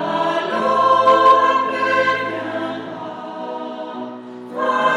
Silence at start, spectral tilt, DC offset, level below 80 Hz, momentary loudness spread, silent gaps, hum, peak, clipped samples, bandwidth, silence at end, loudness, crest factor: 0 s; -4.5 dB/octave; under 0.1%; -74 dBFS; 18 LU; none; none; -2 dBFS; under 0.1%; 10.5 kHz; 0 s; -16 LUFS; 16 dB